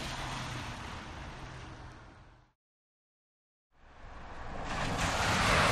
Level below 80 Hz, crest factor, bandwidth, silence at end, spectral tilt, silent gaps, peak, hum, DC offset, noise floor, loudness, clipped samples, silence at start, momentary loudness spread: -46 dBFS; 22 dB; 15 kHz; 0 s; -3.5 dB/octave; 2.55-3.70 s; -16 dBFS; none; under 0.1%; -56 dBFS; -34 LUFS; under 0.1%; 0 s; 23 LU